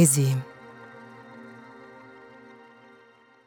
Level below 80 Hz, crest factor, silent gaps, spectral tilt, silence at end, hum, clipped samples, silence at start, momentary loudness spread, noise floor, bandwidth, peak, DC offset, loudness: -76 dBFS; 22 dB; none; -5 dB/octave; 2.6 s; none; under 0.1%; 0 s; 25 LU; -56 dBFS; 17 kHz; -6 dBFS; under 0.1%; -23 LUFS